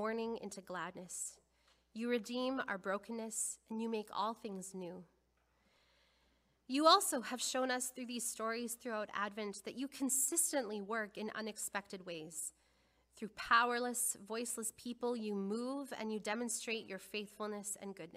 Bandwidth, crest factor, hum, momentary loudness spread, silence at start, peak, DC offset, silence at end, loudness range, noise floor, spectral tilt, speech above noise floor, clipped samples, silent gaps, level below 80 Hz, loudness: 15.5 kHz; 26 dB; none; 14 LU; 0 s; -14 dBFS; under 0.1%; 0 s; 6 LU; -77 dBFS; -2 dB/octave; 38 dB; under 0.1%; none; -78 dBFS; -39 LUFS